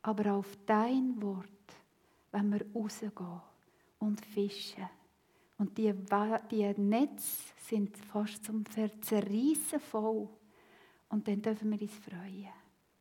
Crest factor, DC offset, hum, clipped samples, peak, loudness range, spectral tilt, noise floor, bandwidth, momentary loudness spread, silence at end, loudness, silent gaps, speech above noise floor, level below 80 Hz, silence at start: 20 dB; under 0.1%; none; under 0.1%; -16 dBFS; 5 LU; -5.5 dB/octave; -70 dBFS; 18 kHz; 15 LU; 0.4 s; -35 LUFS; none; 36 dB; -84 dBFS; 0.05 s